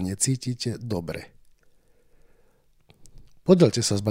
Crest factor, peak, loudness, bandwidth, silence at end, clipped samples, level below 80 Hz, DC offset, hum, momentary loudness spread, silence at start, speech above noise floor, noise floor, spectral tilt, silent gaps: 22 dB; -4 dBFS; -24 LUFS; 16 kHz; 0 s; under 0.1%; -56 dBFS; under 0.1%; none; 14 LU; 0 s; 37 dB; -60 dBFS; -5 dB/octave; none